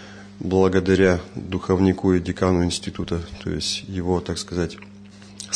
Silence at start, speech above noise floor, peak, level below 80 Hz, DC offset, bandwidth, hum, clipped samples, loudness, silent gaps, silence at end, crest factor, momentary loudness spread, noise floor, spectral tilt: 0 s; 22 dB; -4 dBFS; -44 dBFS; under 0.1%; 10.5 kHz; none; under 0.1%; -22 LUFS; none; 0 s; 18 dB; 12 LU; -43 dBFS; -5.5 dB/octave